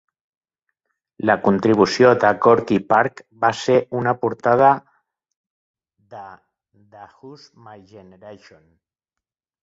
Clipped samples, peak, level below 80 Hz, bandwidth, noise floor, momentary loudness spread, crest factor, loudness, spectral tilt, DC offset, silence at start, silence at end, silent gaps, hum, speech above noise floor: under 0.1%; 0 dBFS; -58 dBFS; 8 kHz; -86 dBFS; 10 LU; 20 dB; -17 LUFS; -6 dB/octave; under 0.1%; 1.25 s; 1.3 s; 5.36-5.44 s, 5.50-5.74 s; none; 68 dB